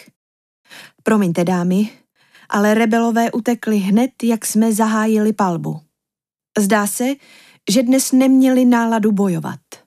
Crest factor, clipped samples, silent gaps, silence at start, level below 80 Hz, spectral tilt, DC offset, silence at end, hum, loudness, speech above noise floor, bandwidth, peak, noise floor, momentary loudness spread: 14 dB; under 0.1%; none; 0.7 s; -68 dBFS; -5.5 dB/octave; under 0.1%; 0.1 s; none; -16 LUFS; 73 dB; 15.5 kHz; -4 dBFS; -88 dBFS; 12 LU